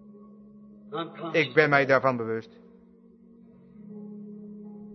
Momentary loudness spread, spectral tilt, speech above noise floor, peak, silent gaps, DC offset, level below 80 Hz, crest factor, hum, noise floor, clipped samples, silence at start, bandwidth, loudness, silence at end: 23 LU; -6.5 dB/octave; 30 dB; -4 dBFS; none; under 0.1%; -74 dBFS; 24 dB; none; -55 dBFS; under 0.1%; 0.2 s; 6.2 kHz; -25 LUFS; 0 s